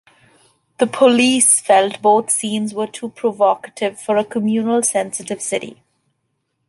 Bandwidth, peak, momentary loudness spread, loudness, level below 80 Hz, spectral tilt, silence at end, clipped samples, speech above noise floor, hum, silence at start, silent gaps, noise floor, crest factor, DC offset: 12 kHz; -2 dBFS; 12 LU; -16 LUFS; -66 dBFS; -2.5 dB/octave; 0.95 s; under 0.1%; 54 dB; none; 0.8 s; none; -71 dBFS; 16 dB; under 0.1%